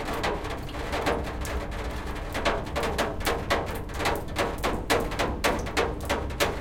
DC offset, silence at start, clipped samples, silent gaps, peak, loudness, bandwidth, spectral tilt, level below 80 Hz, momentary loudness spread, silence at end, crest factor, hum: under 0.1%; 0 s; under 0.1%; none; -8 dBFS; -29 LUFS; 17 kHz; -4 dB/octave; -36 dBFS; 7 LU; 0 s; 20 dB; none